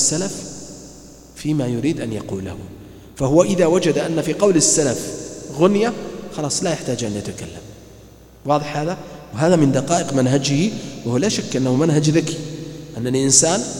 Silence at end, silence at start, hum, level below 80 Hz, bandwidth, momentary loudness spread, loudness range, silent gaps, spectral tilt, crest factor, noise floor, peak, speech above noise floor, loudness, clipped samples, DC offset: 0 s; 0 s; none; -48 dBFS; 17 kHz; 18 LU; 6 LU; none; -4.5 dB/octave; 20 dB; -44 dBFS; 0 dBFS; 25 dB; -18 LUFS; under 0.1%; under 0.1%